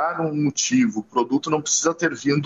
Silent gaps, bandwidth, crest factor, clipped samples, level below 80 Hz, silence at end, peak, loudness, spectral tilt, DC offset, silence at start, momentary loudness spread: none; 8.2 kHz; 16 dB; under 0.1%; -66 dBFS; 0 s; -6 dBFS; -21 LUFS; -3.5 dB/octave; under 0.1%; 0 s; 4 LU